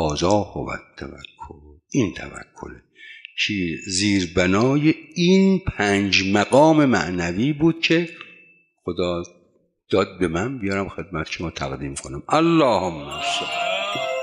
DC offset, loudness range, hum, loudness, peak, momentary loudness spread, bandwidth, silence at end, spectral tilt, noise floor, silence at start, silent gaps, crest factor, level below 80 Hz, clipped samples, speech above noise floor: under 0.1%; 8 LU; none; -21 LUFS; -4 dBFS; 20 LU; 11 kHz; 0 s; -5 dB/octave; -62 dBFS; 0 s; none; 18 dB; -48 dBFS; under 0.1%; 41 dB